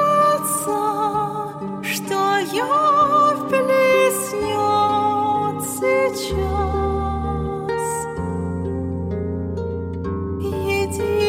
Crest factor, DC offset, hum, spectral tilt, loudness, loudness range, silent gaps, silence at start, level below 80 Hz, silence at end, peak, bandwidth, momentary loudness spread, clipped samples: 14 dB; under 0.1%; none; -4.5 dB/octave; -20 LUFS; 7 LU; none; 0 s; -36 dBFS; 0 s; -6 dBFS; 17 kHz; 10 LU; under 0.1%